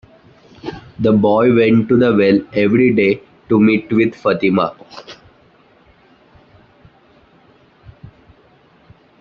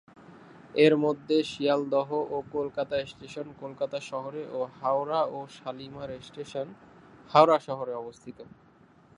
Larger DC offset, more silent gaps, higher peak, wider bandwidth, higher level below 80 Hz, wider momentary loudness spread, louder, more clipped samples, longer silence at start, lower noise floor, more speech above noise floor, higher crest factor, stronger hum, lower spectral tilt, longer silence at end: neither; neither; about the same, -2 dBFS vs -4 dBFS; second, 6.4 kHz vs 10.5 kHz; first, -52 dBFS vs -68 dBFS; about the same, 19 LU vs 18 LU; first, -14 LUFS vs -28 LUFS; neither; first, 0.65 s vs 0.2 s; second, -50 dBFS vs -58 dBFS; first, 37 dB vs 30 dB; second, 14 dB vs 24 dB; neither; about the same, -6 dB/octave vs -6 dB/octave; first, 4.05 s vs 0.75 s